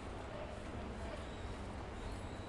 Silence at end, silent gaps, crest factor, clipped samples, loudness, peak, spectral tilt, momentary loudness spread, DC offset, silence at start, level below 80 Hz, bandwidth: 0 s; none; 12 dB; under 0.1%; -47 LUFS; -34 dBFS; -6 dB/octave; 1 LU; under 0.1%; 0 s; -50 dBFS; 11.5 kHz